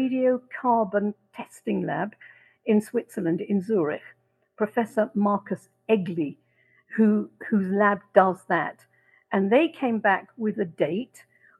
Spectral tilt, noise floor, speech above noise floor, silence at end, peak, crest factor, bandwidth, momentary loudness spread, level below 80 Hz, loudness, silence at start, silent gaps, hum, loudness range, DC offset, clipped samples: -7.5 dB/octave; -64 dBFS; 39 dB; 0.55 s; -4 dBFS; 22 dB; 12.5 kHz; 12 LU; -76 dBFS; -25 LUFS; 0 s; none; none; 4 LU; under 0.1%; under 0.1%